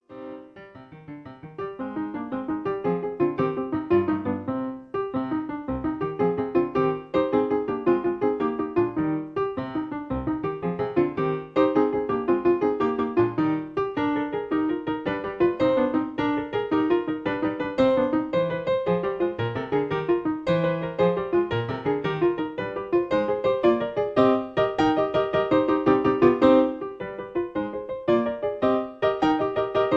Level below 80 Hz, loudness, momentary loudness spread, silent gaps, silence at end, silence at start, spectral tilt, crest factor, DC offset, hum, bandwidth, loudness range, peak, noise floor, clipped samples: -52 dBFS; -25 LUFS; 9 LU; none; 0 s; 0.1 s; -8.5 dB/octave; 20 dB; under 0.1%; none; 7 kHz; 5 LU; -4 dBFS; -45 dBFS; under 0.1%